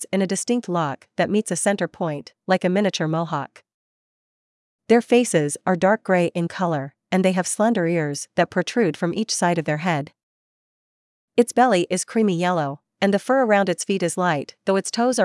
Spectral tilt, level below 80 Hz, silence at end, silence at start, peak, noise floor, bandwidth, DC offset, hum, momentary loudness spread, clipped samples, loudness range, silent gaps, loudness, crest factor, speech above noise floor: -5 dB/octave; -72 dBFS; 0 s; 0 s; -2 dBFS; under -90 dBFS; 12 kHz; under 0.1%; none; 7 LU; under 0.1%; 3 LU; 3.74-4.79 s, 10.23-11.28 s; -21 LUFS; 18 dB; over 69 dB